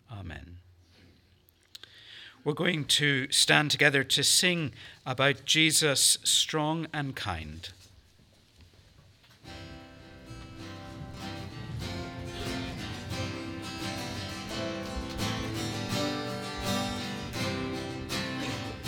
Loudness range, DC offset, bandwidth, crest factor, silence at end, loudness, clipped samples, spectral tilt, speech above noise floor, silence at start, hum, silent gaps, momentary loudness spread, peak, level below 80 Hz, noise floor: 19 LU; under 0.1%; 19 kHz; 26 dB; 0 s; -28 LUFS; under 0.1%; -2.5 dB/octave; 37 dB; 0.1 s; none; none; 23 LU; -4 dBFS; -54 dBFS; -63 dBFS